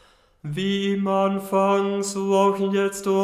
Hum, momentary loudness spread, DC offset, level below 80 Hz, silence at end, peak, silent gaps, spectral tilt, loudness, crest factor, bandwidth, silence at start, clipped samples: none; 6 LU; under 0.1%; -62 dBFS; 0 s; -6 dBFS; none; -5.5 dB/octave; -22 LUFS; 16 dB; 15.5 kHz; 0.45 s; under 0.1%